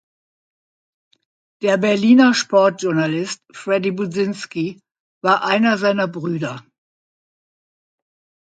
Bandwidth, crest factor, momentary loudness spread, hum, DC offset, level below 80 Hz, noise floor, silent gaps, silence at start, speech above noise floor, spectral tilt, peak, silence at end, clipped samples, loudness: 9.2 kHz; 18 dB; 13 LU; none; under 0.1%; -68 dBFS; under -90 dBFS; 5.00-5.21 s; 1.6 s; over 73 dB; -5 dB/octave; -2 dBFS; 1.95 s; under 0.1%; -18 LUFS